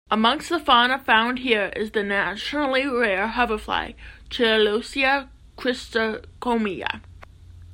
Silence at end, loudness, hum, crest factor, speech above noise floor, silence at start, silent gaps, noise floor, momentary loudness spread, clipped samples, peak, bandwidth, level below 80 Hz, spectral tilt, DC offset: 0 s; -22 LUFS; none; 20 dB; 22 dB; 0.1 s; none; -44 dBFS; 10 LU; under 0.1%; -2 dBFS; 16 kHz; -48 dBFS; -4 dB/octave; under 0.1%